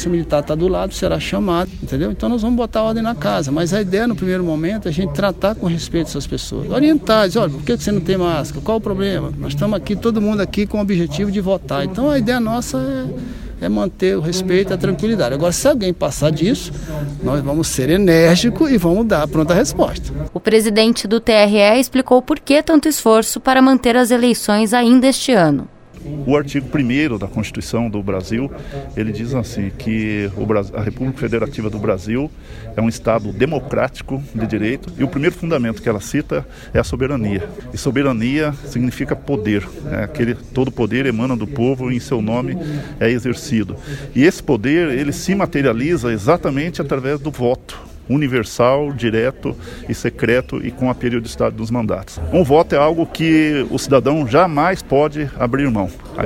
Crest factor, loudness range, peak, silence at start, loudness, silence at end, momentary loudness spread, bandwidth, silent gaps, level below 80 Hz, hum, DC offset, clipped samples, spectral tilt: 16 dB; 7 LU; 0 dBFS; 0 s; -17 LUFS; 0 s; 10 LU; 16.5 kHz; none; -34 dBFS; none; under 0.1%; under 0.1%; -5.5 dB/octave